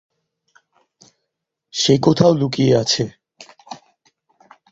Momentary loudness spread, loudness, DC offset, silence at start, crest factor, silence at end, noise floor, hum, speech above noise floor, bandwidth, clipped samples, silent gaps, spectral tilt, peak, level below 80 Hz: 24 LU; -16 LUFS; under 0.1%; 1.75 s; 20 dB; 0.95 s; -79 dBFS; none; 64 dB; 8 kHz; under 0.1%; none; -5.5 dB/octave; -2 dBFS; -54 dBFS